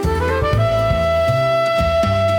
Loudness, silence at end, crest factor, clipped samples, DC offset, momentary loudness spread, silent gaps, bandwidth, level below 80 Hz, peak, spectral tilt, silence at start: -17 LUFS; 0 s; 10 dB; under 0.1%; under 0.1%; 1 LU; none; 18 kHz; -28 dBFS; -6 dBFS; -6.5 dB/octave; 0 s